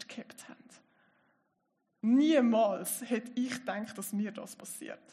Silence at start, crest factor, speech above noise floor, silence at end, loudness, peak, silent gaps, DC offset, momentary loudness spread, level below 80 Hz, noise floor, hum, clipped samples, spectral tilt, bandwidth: 0 s; 18 dB; 48 dB; 0.15 s; -31 LUFS; -14 dBFS; none; under 0.1%; 20 LU; -86 dBFS; -79 dBFS; none; under 0.1%; -4.5 dB/octave; 14.5 kHz